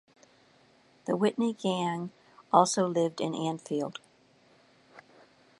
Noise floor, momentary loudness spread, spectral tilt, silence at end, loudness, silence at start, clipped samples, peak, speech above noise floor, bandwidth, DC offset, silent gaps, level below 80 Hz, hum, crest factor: -63 dBFS; 14 LU; -5 dB/octave; 0.6 s; -29 LUFS; 1.05 s; under 0.1%; -6 dBFS; 35 dB; 11.5 kHz; under 0.1%; none; -80 dBFS; none; 24 dB